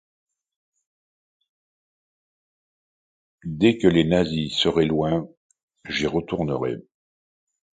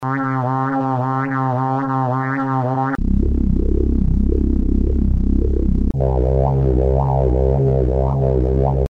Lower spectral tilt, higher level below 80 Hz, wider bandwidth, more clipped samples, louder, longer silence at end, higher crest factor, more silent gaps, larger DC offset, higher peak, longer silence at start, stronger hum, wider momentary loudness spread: second, -6 dB/octave vs -11 dB/octave; second, -50 dBFS vs -20 dBFS; first, 9.2 kHz vs 3.5 kHz; neither; second, -22 LUFS vs -18 LUFS; first, 0.9 s vs 0 s; first, 20 dB vs 14 dB; first, 5.37-5.50 s, 5.63-5.68 s vs none; neither; about the same, -4 dBFS vs -2 dBFS; first, 3.45 s vs 0 s; neither; first, 15 LU vs 3 LU